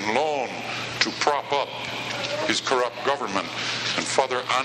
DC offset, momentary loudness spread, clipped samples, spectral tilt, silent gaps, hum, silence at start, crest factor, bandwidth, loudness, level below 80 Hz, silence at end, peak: under 0.1%; 7 LU; under 0.1%; -2.5 dB/octave; none; none; 0 s; 24 dB; 13.5 kHz; -25 LUFS; -64 dBFS; 0 s; -2 dBFS